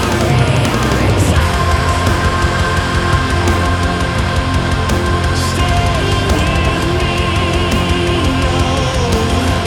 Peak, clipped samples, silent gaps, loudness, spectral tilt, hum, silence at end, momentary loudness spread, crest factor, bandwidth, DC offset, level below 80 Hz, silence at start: 0 dBFS; under 0.1%; none; -14 LUFS; -5 dB/octave; none; 0 s; 2 LU; 12 dB; 17 kHz; under 0.1%; -20 dBFS; 0 s